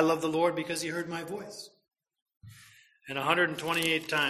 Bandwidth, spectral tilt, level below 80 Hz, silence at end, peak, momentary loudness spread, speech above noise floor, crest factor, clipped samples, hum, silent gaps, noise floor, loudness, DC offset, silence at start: 15 kHz; -3.5 dB/octave; -70 dBFS; 0 s; -10 dBFS; 15 LU; 28 dB; 20 dB; under 0.1%; none; 2.22-2.26 s; -58 dBFS; -30 LUFS; under 0.1%; 0 s